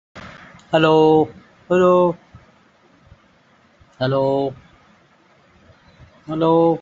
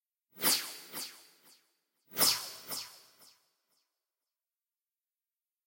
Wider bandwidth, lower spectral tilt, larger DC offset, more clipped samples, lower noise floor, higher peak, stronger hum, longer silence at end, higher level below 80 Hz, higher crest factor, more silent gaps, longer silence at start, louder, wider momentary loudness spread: second, 7.6 kHz vs 16.5 kHz; first, -5.5 dB/octave vs 0 dB/octave; neither; neither; second, -55 dBFS vs under -90 dBFS; first, -2 dBFS vs -12 dBFS; neither; second, 0 s vs 2.7 s; first, -56 dBFS vs -80 dBFS; second, 18 dB vs 26 dB; neither; second, 0.15 s vs 0.35 s; first, -17 LUFS vs -32 LUFS; first, 20 LU vs 15 LU